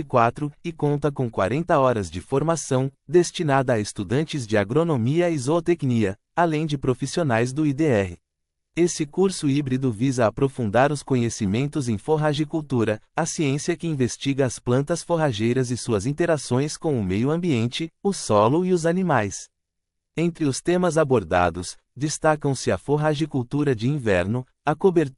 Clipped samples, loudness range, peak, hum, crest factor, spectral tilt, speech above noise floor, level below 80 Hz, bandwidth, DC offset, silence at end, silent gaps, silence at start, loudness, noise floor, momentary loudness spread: under 0.1%; 1 LU; -4 dBFS; none; 18 dB; -6 dB/octave; 58 dB; -52 dBFS; 11.5 kHz; under 0.1%; 0.05 s; none; 0 s; -23 LUFS; -80 dBFS; 6 LU